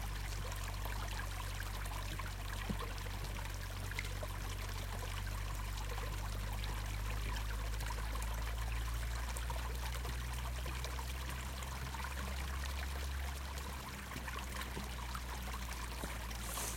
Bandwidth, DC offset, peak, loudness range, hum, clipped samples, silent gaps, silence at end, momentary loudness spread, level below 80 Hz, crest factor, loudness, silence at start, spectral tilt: 17 kHz; under 0.1%; -24 dBFS; 2 LU; none; under 0.1%; none; 0 s; 2 LU; -44 dBFS; 18 dB; -43 LUFS; 0 s; -3.5 dB/octave